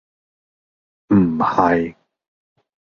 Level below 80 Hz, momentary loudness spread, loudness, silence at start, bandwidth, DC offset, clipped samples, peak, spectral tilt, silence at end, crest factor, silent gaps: -50 dBFS; 5 LU; -17 LUFS; 1.1 s; 6.8 kHz; under 0.1%; under 0.1%; -2 dBFS; -9 dB/octave; 1.05 s; 20 dB; none